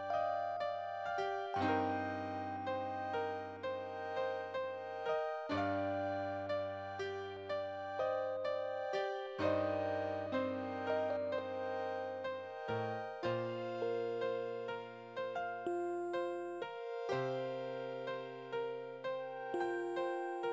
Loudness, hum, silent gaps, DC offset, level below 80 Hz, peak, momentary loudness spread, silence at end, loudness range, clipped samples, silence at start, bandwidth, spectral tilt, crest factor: -40 LUFS; none; none; under 0.1%; -70 dBFS; -22 dBFS; 6 LU; 0 s; 3 LU; under 0.1%; 0 s; 8 kHz; -6.5 dB/octave; 18 dB